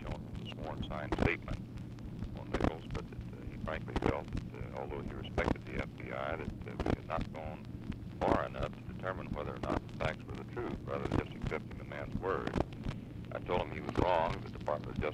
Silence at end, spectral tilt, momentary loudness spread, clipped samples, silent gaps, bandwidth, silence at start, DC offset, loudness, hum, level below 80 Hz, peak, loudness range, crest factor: 0 s; -7.5 dB/octave; 11 LU; under 0.1%; none; 14 kHz; 0 s; under 0.1%; -38 LUFS; none; -46 dBFS; -14 dBFS; 2 LU; 24 dB